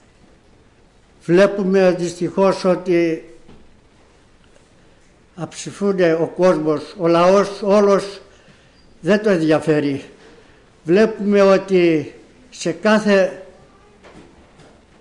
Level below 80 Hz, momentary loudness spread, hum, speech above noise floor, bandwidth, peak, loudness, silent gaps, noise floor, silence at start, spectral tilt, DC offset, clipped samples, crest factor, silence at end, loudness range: -54 dBFS; 15 LU; none; 36 dB; 11 kHz; -6 dBFS; -16 LUFS; none; -51 dBFS; 1.3 s; -6 dB/octave; under 0.1%; under 0.1%; 12 dB; 0.8 s; 5 LU